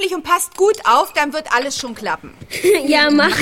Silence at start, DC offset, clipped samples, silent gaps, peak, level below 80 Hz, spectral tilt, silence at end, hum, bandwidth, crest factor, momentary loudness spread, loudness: 0 s; under 0.1%; under 0.1%; none; -2 dBFS; -52 dBFS; -2.5 dB/octave; 0 s; none; 16.5 kHz; 14 dB; 11 LU; -16 LUFS